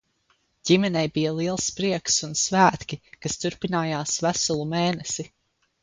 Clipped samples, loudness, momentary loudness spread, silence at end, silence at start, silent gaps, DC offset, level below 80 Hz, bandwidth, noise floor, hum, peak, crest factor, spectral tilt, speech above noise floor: under 0.1%; -24 LUFS; 12 LU; 0.55 s; 0.65 s; none; under 0.1%; -56 dBFS; 9.8 kHz; -68 dBFS; none; -4 dBFS; 22 dB; -3.5 dB/octave; 44 dB